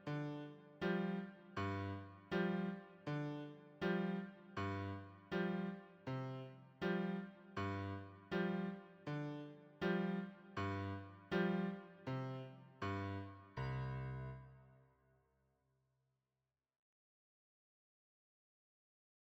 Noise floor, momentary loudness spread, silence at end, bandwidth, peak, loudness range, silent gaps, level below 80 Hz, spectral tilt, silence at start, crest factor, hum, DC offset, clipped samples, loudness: under -90 dBFS; 12 LU; 4.6 s; 7.8 kHz; -28 dBFS; 5 LU; none; -70 dBFS; -8 dB/octave; 0 s; 18 dB; none; under 0.1%; under 0.1%; -45 LUFS